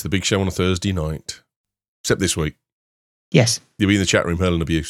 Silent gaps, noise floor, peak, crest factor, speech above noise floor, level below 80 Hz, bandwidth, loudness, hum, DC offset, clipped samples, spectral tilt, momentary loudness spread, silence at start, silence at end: 1.56-1.64 s, 1.88-2.04 s, 2.73-3.32 s; under -90 dBFS; -2 dBFS; 20 dB; over 71 dB; -38 dBFS; 15 kHz; -20 LUFS; none; under 0.1%; under 0.1%; -4.5 dB/octave; 12 LU; 0 s; 0 s